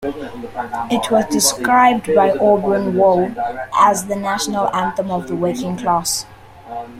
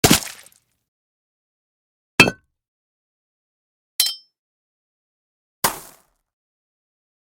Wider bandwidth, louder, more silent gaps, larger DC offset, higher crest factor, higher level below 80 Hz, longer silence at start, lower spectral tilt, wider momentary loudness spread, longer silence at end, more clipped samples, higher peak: second, 16.5 kHz vs 19 kHz; about the same, -16 LUFS vs -18 LUFS; second, none vs 0.88-2.18 s, 2.68-3.99 s, 4.38-5.62 s; neither; second, 16 dB vs 26 dB; about the same, -50 dBFS vs -50 dBFS; about the same, 0 s vs 0.05 s; about the same, -3.5 dB/octave vs -2.5 dB/octave; second, 13 LU vs 19 LU; second, 0 s vs 1.55 s; neither; about the same, 0 dBFS vs 0 dBFS